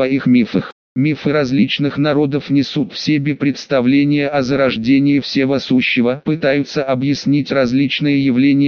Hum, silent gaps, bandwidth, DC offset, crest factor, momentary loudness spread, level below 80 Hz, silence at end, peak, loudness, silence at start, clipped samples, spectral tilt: none; 0.72-0.96 s; 6.8 kHz; under 0.1%; 14 dB; 5 LU; -52 dBFS; 0 s; -2 dBFS; -15 LUFS; 0 s; under 0.1%; -5 dB/octave